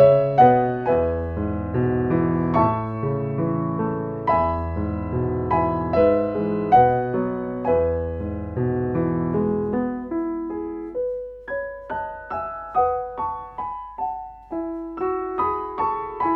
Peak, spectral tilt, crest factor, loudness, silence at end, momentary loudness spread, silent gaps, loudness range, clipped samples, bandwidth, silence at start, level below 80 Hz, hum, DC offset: -4 dBFS; -11 dB/octave; 18 dB; -23 LUFS; 0 s; 12 LU; none; 7 LU; under 0.1%; 5.4 kHz; 0 s; -42 dBFS; none; under 0.1%